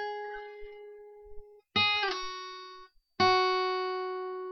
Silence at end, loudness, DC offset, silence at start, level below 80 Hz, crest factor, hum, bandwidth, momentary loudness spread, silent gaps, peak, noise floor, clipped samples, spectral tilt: 0 s; -29 LUFS; under 0.1%; 0 s; -60 dBFS; 20 dB; none; 6.4 kHz; 23 LU; none; -12 dBFS; -53 dBFS; under 0.1%; -4 dB/octave